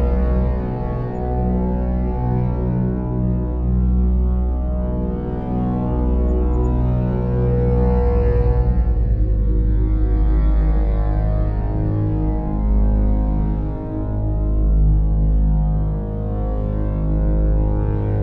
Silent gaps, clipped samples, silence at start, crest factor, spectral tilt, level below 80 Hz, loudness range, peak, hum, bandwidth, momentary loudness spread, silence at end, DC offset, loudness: none; under 0.1%; 0 s; 12 dB; -12.5 dB/octave; -18 dBFS; 2 LU; -6 dBFS; none; 2.7 kHz; 5 LU; 0 s; 0.4%; -20 LUFS